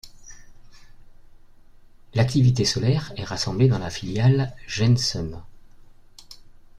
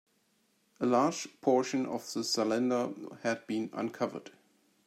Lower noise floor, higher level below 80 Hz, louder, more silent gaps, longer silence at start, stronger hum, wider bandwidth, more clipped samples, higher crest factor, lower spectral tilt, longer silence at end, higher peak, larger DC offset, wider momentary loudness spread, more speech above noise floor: second, -47 dBFS vs -73 dBFS; first, -46 dBFS vs -82 dBFS; first, -22 LUFS vs -32 LUFS; neither; second, 0.05 s vs 0.8 s; neither; second, 11.5 kHz vs 15 kHz; neither; about the same, 18 dB vs 20 dB; first, -5.5 dB/octave vs -4 dB/octave; second, 0.3 s vs 0.55 s; first, -6 dBFS vs -14 dBFS; neither; first, 12 LU vs 8 LU; second, 26 dB vs 41 dB